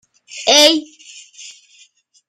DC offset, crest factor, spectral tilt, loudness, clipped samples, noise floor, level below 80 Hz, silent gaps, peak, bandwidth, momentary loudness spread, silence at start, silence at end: under 0.1%; 18 dB; 0.5 dB/octave; -12 LUFS; under 0.1%; -52 dBFS; -66 dBFS; none; 0 dBFS; 15.5 kHz; 26 LU; 0.35 s; 0.8 s